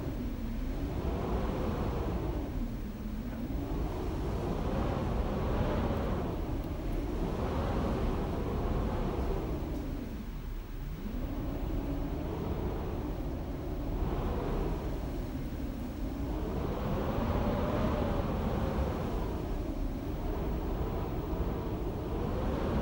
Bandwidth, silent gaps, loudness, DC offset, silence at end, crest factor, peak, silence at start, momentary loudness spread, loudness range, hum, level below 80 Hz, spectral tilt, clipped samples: 16 kHz; none; -35 LUFS; under 0.1%; 0 s; 14 dB; -18 dBFS; 0 s; 6 LU; 4 LU; none; -38 dBFS; -8 dB/octave; under 0.1%